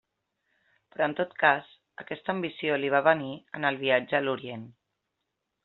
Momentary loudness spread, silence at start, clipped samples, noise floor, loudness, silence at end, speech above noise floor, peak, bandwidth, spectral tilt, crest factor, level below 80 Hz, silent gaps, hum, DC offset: 16 LU; 1 s; under 0.1%; -82 dBFS; -27 LUFS; 0.95 s; 55 dB; -6 dBFS; 4.3 kHz; -2.5 dB/octave; 24 dB; -74 dBFS; none; none; under 0.1%